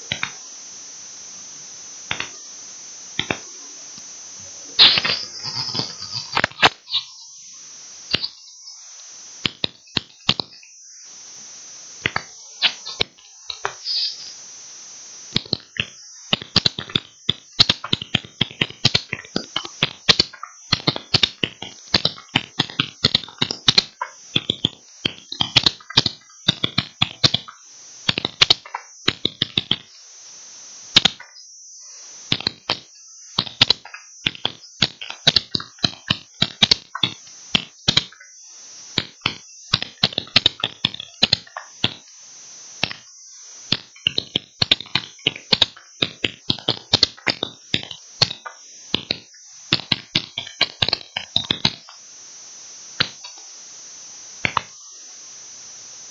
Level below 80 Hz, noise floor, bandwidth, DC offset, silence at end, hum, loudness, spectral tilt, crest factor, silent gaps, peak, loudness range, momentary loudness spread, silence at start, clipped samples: -52 dBFS; -44 dBFS; 13 kHz; under 0.1%; 0 s; none; -20 LUFS; -2 dB/octave; 24 dB; none; 0 dBFS; 7 LU; 21 LU; 0 s; under 0.1%